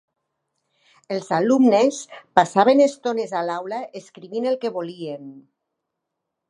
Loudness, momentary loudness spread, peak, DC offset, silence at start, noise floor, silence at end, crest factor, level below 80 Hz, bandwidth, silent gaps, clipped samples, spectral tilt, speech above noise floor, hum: -20 LUFS; 17 LU; 0 dBFS; under 0.1%; 1.1 s; -81 dBFS; 1.1 s; 22 dB; -76 dBFS; 11 kHz; none; under 0.1%; -5 dB/octave; 60 dB; none